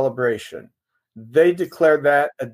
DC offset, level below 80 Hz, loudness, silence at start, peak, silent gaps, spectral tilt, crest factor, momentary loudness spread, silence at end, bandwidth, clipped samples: under 0.1%; -70 dBFS; -18 LUFS; 0 s; -4 dBFS; none; -6.5 dB/octave; 16 dB; 15 LU; 0.05 s; 15.5 kHz; under 0.1%